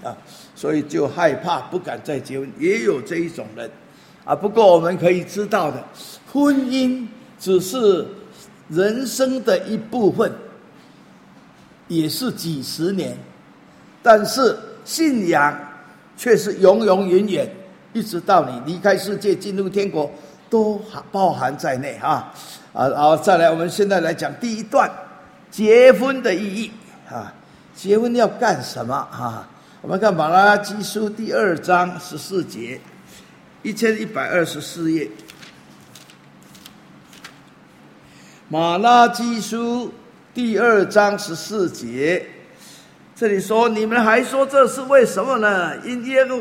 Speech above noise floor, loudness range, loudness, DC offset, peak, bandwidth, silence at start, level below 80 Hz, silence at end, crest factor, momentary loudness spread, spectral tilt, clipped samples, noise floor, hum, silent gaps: 29 dB; 7 LU; -18 LUFS; under 0.1%; 0 dBFS; 16.5 kHz; 0 s; -64 dBFS; 0 s; 20 dB; 17 LU; -5 dB/octave; under 0.1%; -47 dBFS; none; none